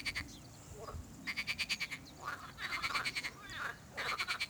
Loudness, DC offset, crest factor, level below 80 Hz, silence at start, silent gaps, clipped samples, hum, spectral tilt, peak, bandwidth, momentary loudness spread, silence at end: -40 LUFS; under 0.1%; 22 dB; -62 dBFS; 0 s; none; under 0.1%; none; -2 dB/octave; -20 dBFS; over 20 kHz; 12 LU; 0 s